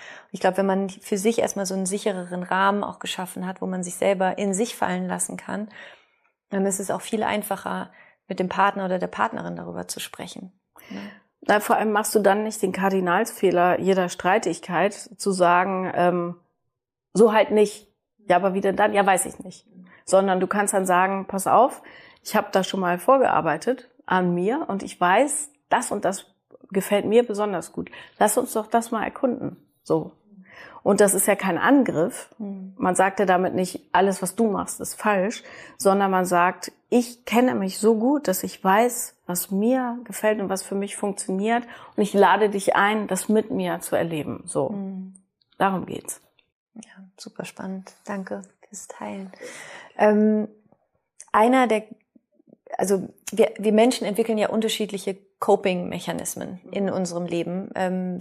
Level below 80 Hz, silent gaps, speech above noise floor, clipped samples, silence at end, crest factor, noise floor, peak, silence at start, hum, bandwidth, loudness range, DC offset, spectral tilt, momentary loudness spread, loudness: -68 dBFS; 46.52-46.66 s; 58 dB; under 0.1%; 0 s; 18 dB; -81 dBFS; -6 dBFS; 0 s; none; 15.5 kHz; 6 LU; under 0.1%; -4.5 dB/octave; 16 LU; -23 LUFS